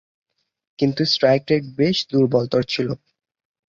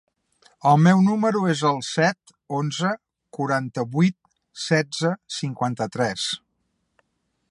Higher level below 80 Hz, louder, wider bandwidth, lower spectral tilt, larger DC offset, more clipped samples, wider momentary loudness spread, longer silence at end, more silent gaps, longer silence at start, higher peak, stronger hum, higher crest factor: first, -58 dBFS vs -66 dBFS; about the same, -20 LUFS vs -22 LUFS; second, 7.4 kHz vs 11.5 kHz; about the same, -6 dB/octave vs -5.5 dB/octave; neither; neither; second, 7 LU vs 13 LU; second, 0.75 s vs 1.15 s; neither; first, 0.8 s vs 0.65 s; about the same, -4 dBFS vs -4 dBFS; neither; about the same, 18 dB vs 18 dB